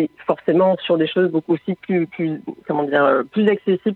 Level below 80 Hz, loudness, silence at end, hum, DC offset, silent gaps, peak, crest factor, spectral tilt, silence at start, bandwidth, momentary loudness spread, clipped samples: -68 dBFS; -19 LUFS; 0 s; none; under 0.1%; none; -2 dBFS; 16 dB; -9 dB/octave; 0 s; 4.3 kHz; 8 LU; under 0.1%